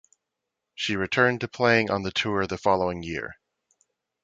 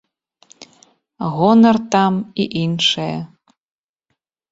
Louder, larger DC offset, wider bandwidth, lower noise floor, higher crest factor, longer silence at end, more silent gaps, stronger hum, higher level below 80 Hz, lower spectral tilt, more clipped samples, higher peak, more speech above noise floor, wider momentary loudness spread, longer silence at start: second, -25 LUFS vs -16 LUFS; neither; first, 9 kHz vs 7.8 kHz; first, -84 dBFS vs -74 dBFS; first, 22 dB vs 16 dB; second, 0.9 s vs 1.25 s; neither; neither; about the same, -54 dBFS vs -58 dBFS; about the same, -5 dB/octave vs -5.5 dB/octave; neither; second, -6 dBFS vs -2 dBFS; about the same, 59 dB vs 58 dB; second, 11 LU vs 15 LU; second, 0.8 s vs 1.2 s